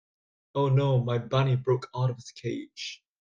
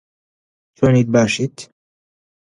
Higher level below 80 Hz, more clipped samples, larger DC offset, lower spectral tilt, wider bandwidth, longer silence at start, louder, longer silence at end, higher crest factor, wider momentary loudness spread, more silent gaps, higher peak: second, -64 dBFS vs -50 dBFS; neither; neither; about the same, -7 dB/octave vs -6 dB/octave; second, 7.4 kHz vs 11 kHz; second, 0.55 s vs 0.8 s; second, -28 LUFS vs -16 LUFS; second, 0.25 s vs 0.9 s; second, 14 dB vs 20 dB; about the same, 13 LU vs 12 LU; neither; second, -14 dBFS vs 0 dBFS